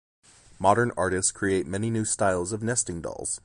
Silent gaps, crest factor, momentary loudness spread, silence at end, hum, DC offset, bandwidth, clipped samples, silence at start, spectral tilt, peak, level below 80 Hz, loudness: none; 22 dB; 7 LU; 0.05 s; none; under 0.1%; 11.5 kHz; under 0.1%; 0.6 s; -4 dB/octave; -6 dBFS; -50 dBFS; -26 LUFS